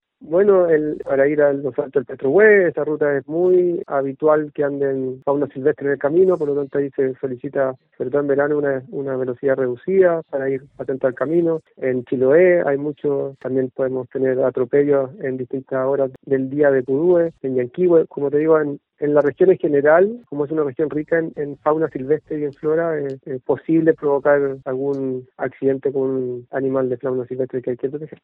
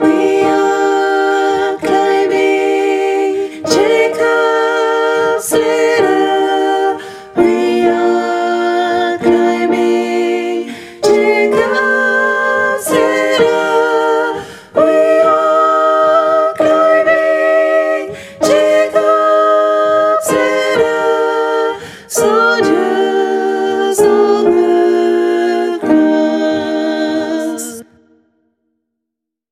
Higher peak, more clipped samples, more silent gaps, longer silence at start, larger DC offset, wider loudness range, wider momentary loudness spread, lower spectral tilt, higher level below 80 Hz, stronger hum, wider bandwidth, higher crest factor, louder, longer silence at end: about the same, 0 dBFS vs 0 dBFS; neither; neither; first, 0.2 s vs 0 s; neither; about the same, 4 LU vs 2 LU; first, 10 LU vs 6 LU; first, -11 dB/octave vs -3.5 dB/octave; second, -62 dBFS vs -56 dBFS; neither; second, 3.8 kHz vs 15.5 kHz; first, 18 dB vs 12 dB; second, -19 LUFS vs -12 LUFS; second, 0.15 s vs 1.7 s